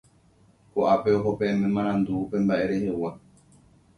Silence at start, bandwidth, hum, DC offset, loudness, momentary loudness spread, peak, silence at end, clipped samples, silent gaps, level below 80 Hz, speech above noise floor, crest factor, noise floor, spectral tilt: 0.75 s; 10.5 kHz; none; under 0.1%; -25 LUFS; 8 LU; -8 dBFS; 0.8 s; under 0.1%; none; -56 dBFS; 35 dB; 18 dB; -59 dBFS; -8 dB/octave